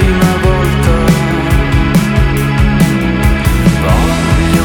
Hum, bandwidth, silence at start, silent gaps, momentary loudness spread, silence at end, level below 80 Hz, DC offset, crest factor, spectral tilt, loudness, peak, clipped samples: none; 18.5 kHz; 0 s; none; 2 LU; 0 s; -16 dBFS; under 0.1%; 10 dB; -6 dB/octave; -11 LUFS; 0 dBFS; under 0.1%